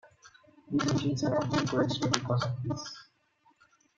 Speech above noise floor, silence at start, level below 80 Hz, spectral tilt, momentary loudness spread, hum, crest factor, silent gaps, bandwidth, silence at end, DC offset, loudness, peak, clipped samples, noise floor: 39 dB; 0.05 s; -64 dBFS; -5.5 dB/octave; 9 LU; none; 32 dB; none; 7.8 kHz; 0.95 s; under 0.1%; -30 LUFS; 0 dBFS; under 0.1%; -68 dBFS